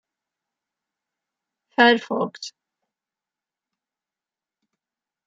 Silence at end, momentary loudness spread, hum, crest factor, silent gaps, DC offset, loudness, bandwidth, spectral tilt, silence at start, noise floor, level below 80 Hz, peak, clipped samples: 2.75 s; 20 LU; none; 24 dB; none; under 0.1%; -20 LUFS; 7.8 kHz; -4 dB/octave; 1.8 s; under -90 dBFS; -78 dBFS; -4 dBFS; under 0.1%